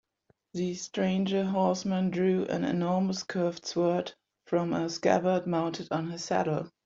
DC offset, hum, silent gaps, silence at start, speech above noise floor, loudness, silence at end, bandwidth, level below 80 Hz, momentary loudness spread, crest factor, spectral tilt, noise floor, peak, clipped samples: under 0.1%; none; none; 0.55 s; 43 dB; -29 LUFS; 0.2 s; 7.6 kHz; -68 dBFS; 6 LU; 18 dB; -6 dB/octave; -71 dBFS; -10 dBFS; under 0.1%